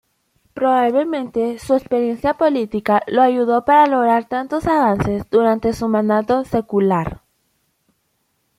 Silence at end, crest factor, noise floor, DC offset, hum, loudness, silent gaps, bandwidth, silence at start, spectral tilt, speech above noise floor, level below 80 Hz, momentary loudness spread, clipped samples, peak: 1.45 s; 16 dB; -67 dBFS; under 0.1%; none; -17 LUFS; none; 15.5 kHz; 0.55 s; -7 dB/octave; 51 dB; -46 dBFS; 7 LU; under 0.1%; -2 dBFS